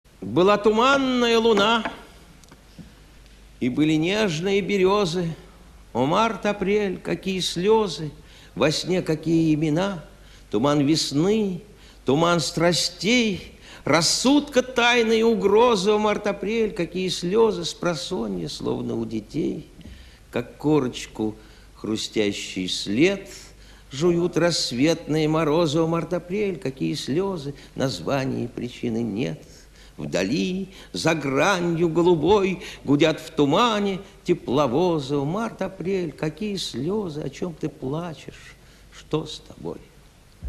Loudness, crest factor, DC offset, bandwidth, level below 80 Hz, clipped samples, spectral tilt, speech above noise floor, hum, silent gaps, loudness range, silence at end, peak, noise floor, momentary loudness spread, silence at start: -23 LUFS; 18 dB; under 0.1%; 13 kHz; -50 dBFS; under 0.1%; -5 dB/octave; 29 dB; none; none; 7 LU; 0 s; -6 dBFS; -51 dBFS; 13 LU; 0.2 s